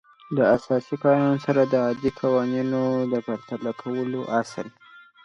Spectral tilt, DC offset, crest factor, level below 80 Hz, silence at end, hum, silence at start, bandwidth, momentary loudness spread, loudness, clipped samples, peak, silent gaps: -7.5 dB/octave; under 0.1%; 18 dB; -60 dBFS; 0.25 s; none; 0.3 s; 10.5 kHz; 10 LU; -24 LUFS; under 0.1%; -6 dBFS; none